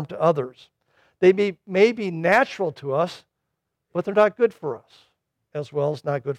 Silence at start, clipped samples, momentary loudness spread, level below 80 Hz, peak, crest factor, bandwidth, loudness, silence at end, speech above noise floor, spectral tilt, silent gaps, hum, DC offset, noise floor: 0 s; under 0.1%; 14 LU; -70 dBFS; -6 dBFS; 18 dB; 10.5 kHz; -22 LUFS; 0 s; 58 dB; -6.5 dB/octave; none; none; under 0.1%; -79 dBFS